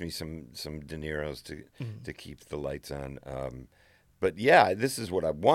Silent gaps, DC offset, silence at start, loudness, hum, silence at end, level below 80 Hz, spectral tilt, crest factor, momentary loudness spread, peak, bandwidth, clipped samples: none; under 0.1%; 0 s; -29 LUFS; none; 0 s; -52 dBFS; -5 dB/octave; 24 dB; 21 LU; -6 dBFS; 16.5 kHz; under 0.1%